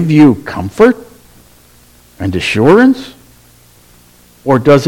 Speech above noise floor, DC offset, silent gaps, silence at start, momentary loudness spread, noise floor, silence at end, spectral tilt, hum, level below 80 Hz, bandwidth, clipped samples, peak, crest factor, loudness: 35 dB; under 0.1%; none; 0 s; 15 LU; -44 dBFS; 0 s; -7 dB/octave; 60 Hz at -45 dBFS; -42 dBFS; 16.5 kHz; 1%; 0 dBFS; 12 dB; -11 LUFS